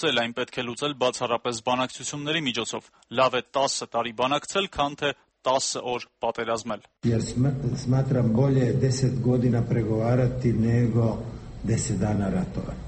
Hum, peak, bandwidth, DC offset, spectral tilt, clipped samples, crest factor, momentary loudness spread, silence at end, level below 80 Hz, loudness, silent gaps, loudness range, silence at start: none; -8 dBFS; 8.8 kHz; under 0.1%; -5.5 dB/octave; under 0.1%; 18 dB; 8 LU; 0 s; -46 dBFS; -25 LUFS; none; 4 LU; 0 s